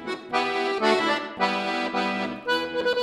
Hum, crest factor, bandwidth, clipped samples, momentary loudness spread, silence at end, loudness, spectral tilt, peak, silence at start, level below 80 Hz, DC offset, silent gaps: none; 18 dB; 15 kHz; under 0.1%; 5 LU; 0 s; -25 LUFS; -4 dB/octave; -8 dBFS; 0 s; -64 dBFS; under 0.1%; none